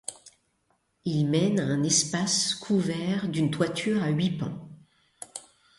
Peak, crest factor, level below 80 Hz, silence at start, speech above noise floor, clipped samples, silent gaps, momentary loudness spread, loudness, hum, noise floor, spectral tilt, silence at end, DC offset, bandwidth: -10 dBFS; 18 dB; -64 dBFS; 0.1 s; 46 dB; under 0.1%; none; 18 LU; -26 LUFS; none; -72 dBFS; -4.5 dB/octave; 0.4 s; under 0.1%; 11.5 kHz